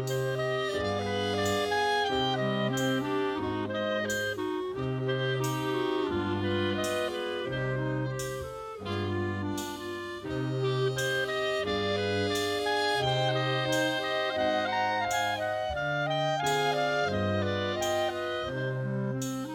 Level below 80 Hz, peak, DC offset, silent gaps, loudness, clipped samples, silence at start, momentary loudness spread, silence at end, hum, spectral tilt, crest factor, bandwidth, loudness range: -58 dBFS; -16 dBFS; under 0.1%; none; -30 LUFS; under 0.1%; 0 s; 6 LU; 0 s; none; -5 dB/octave; 14 dB; 17.5 kHz; 4 LU